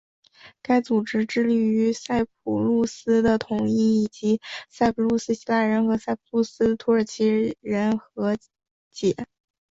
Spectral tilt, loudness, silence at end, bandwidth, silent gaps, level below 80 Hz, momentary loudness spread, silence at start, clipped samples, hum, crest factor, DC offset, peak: -6 dB/octave; -23 LUFS; 0.5 s; 7.8 kHz; 8.71-8.91 s; -56 dBFS; 6 LU; 0.45 s; under 0.1%; none; 16 dB; under 0.1%; -8 dBFS